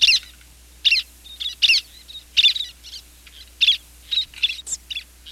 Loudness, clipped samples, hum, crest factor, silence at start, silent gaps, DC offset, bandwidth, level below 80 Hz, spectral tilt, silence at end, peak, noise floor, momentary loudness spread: -19 LUFS; under 0.1%; none; 18 dB; 0 s; none; under 0.1%; 17 kHz; -50 dBFS; 2.5 dB/octave; 0 s; -6 dBFS; -47 dBFS; 22 LU